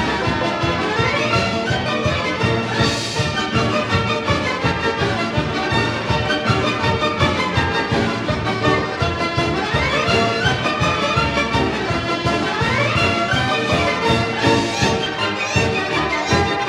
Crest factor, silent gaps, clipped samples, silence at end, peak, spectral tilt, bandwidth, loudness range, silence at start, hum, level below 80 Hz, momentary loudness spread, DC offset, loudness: 18 dB; none; under 0.1%; 0 s; -2 dBFS; -5 dB/octave; 13 kHz; 1 LU; 0 s; none; -36 dBFS; 3 LU; under 0.1%; -18 LUFS